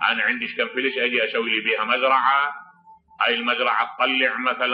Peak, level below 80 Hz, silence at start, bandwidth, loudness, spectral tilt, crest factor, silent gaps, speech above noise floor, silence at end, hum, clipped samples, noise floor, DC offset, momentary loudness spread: -6 dBFS; -74 dBFS; 0 s; 5.4 kHz; -21 LUFS; -6 dB/octave; 16 dB; none; 29 dB; 0 s; none; under 0.1%; -51 dBFS; under 0.1%; 6 LU